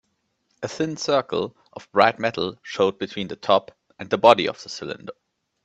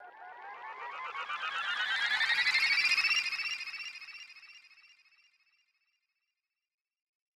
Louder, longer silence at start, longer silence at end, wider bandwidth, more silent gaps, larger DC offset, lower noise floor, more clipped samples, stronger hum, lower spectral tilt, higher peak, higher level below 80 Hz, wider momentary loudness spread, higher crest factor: first, -22 LUFS vs -29 LUFS; first, 0.6 s vs 0 s; second, 0.5 s vs 2.6 s; second, 8.4 kHz vs 17.5 kHz; neither; neither; second, -72 dBFS vs -89 dBFS; neither; neither; first, -4.5 dB/octave vs 2 dB/octave; first, 0 dBFS vs -16 dBFS; first, -64 dBFS vs -86 dBFS; second, 17 LU vs 22 LU; about the same, 24 dB vs 20 dB